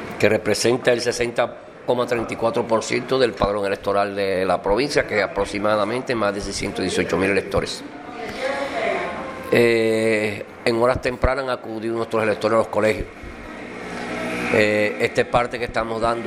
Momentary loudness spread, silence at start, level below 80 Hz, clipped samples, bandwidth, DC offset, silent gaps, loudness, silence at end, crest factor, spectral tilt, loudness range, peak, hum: 10 LU; 0 s; -40 dBFS; under 0.1%; 15 kHz; under 0.1%; none; -21 LUFS; 0 s; 20 dB; -4.5 dB/octave; 2 LU; 0 dBFS; none